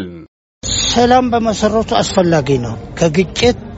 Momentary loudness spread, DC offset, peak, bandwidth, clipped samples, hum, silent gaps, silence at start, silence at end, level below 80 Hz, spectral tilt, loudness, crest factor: 8 LU; under 0.1%; 0 dBFS; 8.2 kHz; under 0.1%; none; 0.28-0.61 s; 0 s; 0 s; -34 dBFS; -4.5 dB/octave; -14 LUFS; 14 dB